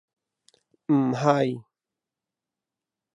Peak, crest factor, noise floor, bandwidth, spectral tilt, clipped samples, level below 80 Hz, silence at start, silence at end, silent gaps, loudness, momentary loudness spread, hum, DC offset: -4 dBFS; 24 dB; -88 dBFS; 9.8 kHz; -7.5 dB/octave; under 0.1%; -78 dBFS; 0.9 s; 1.55 s; none; -24 LUFS; 17 LU; none; under 0.1%